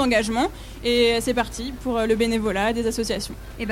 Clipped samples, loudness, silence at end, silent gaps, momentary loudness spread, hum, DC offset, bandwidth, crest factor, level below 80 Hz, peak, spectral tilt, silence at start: under 0.1%; -23 LUFS; 0 s; none; 9 LU; none; under 0.1%; 16.5 kHz; 16 dB; -38 dBFS; -8 dBFS; -4 dB/octave; 0 s